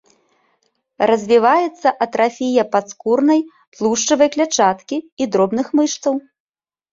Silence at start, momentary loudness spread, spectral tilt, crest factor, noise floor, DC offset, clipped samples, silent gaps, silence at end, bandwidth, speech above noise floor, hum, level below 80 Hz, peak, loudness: 1 s; 8 LU; -3.5 dB/octave; 16 dB; -66 dBFS; under 0.1%; under 0.1%; 3.67-3.72 s, 5.12-5.17 s; 0.7 s; 7.8 kHz; 50 dB; none; -62 dBFS; -2 dBFS; -17 LUFS